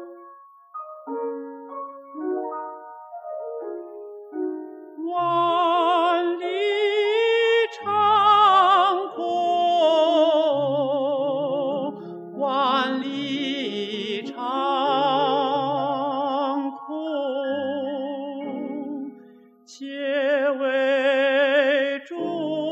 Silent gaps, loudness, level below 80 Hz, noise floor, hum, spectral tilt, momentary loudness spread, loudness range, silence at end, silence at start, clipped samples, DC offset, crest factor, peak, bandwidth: none; -22 LUFS; under -90 dBFS; -50 dBFS; none; -5 dB/octave; 17 LU; 14 LU; 0 s; 0 s; under 0.1%; under 0.1%; 16 dB; -6 dBFS; 8.6 kHz